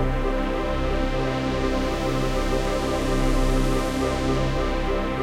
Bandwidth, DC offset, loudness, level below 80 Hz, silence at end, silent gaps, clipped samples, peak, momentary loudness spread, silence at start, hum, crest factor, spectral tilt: 15 kHz; under 0.1%; -25 LUFS; -26 dBFS; 0 s; none; under 0.1%; -10 dBFS; 2 LU; 0 s; none; 12 dB; -6 dB/octave